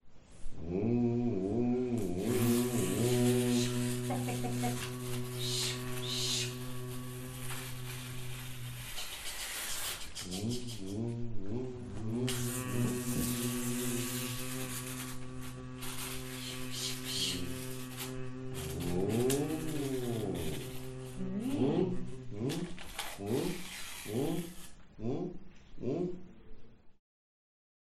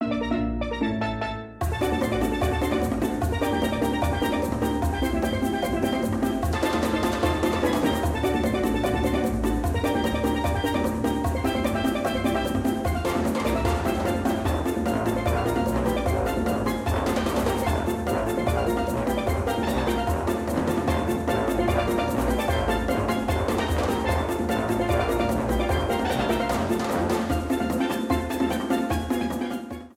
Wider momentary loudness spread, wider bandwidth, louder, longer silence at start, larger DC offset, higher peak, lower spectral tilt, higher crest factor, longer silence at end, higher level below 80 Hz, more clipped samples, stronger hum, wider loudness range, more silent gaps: first, 12 LU vs 2 LU; about the same, 15.5 kHz vs 17 kHz; second, -36 LUFS vs -25 LUFS; about the same, 0 s vs 0 s; first, 0.1% vs under 0.1%; about the same, -12 dBFS vs -10 dBFS; second, -4.5 dB/octave vs -6 dB/octave; first, 22 dB vs 14 dB; first, 1 s vs 0.05 s; second, -52 dBFS vs -36 dBFS; neither; neither; first, 8 LU vs 1 LU; neither